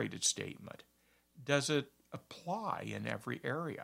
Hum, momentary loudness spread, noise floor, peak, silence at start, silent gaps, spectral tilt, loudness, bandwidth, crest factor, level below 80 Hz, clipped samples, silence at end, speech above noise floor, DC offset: none; 18 LU; -64 dBFS; -14 dBFS; 0 s; none; -3 dB/octave; -37 LUFS; 16 kHz; 26 dB; -78 dBFS; under 0.1%; 0 s; 26 dB; under 0.1%